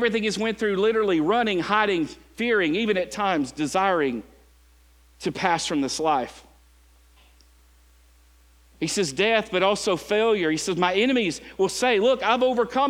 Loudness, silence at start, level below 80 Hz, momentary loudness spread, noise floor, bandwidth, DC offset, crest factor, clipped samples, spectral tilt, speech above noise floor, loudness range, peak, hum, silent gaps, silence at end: -23 LUFS; 0 s; -56 dBFS; 7 LU; -56 dBFS; 16 kHz; under 0.1%; 20 dB; under 0.1%; -4 dB/octave; 33 dB; 7 LU; -4 dBFS; none; none; 0 s